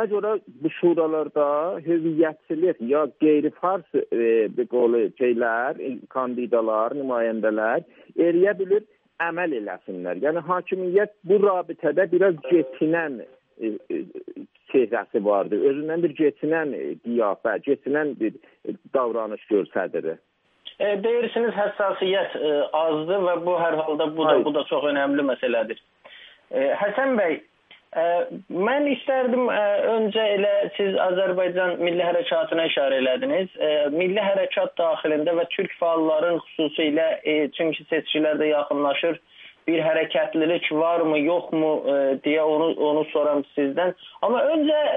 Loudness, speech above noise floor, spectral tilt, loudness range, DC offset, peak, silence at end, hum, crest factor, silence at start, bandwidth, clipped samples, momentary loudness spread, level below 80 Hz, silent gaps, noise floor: -23 LUFS; 26 dB; -9 dB/octave; 3 LU; under 0.1%; -6 dBFS; 0 s; none; 18 dB; 0 s; 3.9 kHz; under 0.1%; 7 LU; -78 dBFS; none; -48 dBFS